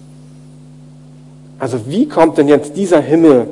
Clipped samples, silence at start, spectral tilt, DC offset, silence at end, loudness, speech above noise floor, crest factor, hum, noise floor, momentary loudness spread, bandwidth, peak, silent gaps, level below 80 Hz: 0.2%; 1.6 s; -7 dB/octave; under 0.1%; 0 s; -12 LUFS; 27 dB; 14 dB; 50 Hz at -40 dBFS; -38 dBFS; 12 LU; 11.5 kHz; 0 dBFS; none; -52 dBFS